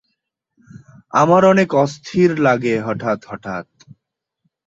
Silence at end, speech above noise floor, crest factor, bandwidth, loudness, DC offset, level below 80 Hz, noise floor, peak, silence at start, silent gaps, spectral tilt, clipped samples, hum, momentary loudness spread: 1.05 s; 61 dB; 16 dB; 7.8 kHz; -16 LUFS; under 0.1%; -58 dBFS; -77 dBFS; -2 dBFS; 0.75 s; none; -6.5 dB/octave; under 0.1%; none; 16 LU